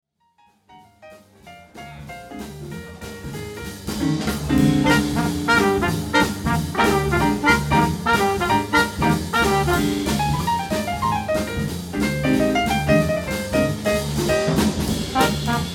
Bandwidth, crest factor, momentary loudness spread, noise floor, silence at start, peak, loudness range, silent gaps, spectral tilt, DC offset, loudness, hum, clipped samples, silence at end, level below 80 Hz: 18.5 kHz; 18 dB; 16 LU; -60 dBFS; 0.7 s; -2 dBFS; 11 LU; none; -5 dB/octave; under 0.1%; -20 LUFS; none; under 0.1%; 0 s; -36 dBFS